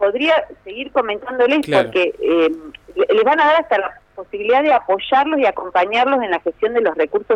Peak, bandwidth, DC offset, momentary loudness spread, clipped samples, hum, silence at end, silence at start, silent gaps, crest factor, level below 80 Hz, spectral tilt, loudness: -4 dBFS; 11 kHz; under 0.1%; 10 LU; under 0.1%; none; 0 s; 0 s; none; 14 dB; -54 dBFS; -5.5 dB/octave; -17 LUFS